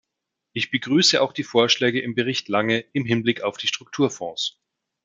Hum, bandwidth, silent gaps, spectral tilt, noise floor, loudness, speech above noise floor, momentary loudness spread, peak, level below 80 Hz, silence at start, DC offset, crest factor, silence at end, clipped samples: none; 9.4 kHz; none; -3.5 dB/octave; -83 dBFS; -22 LUFS; 60 dB; 10 LU; -2 dBFS; -68 dBFS; 0.55 s; under 0.1%; 20 dB; 0.55 s; under 0.1%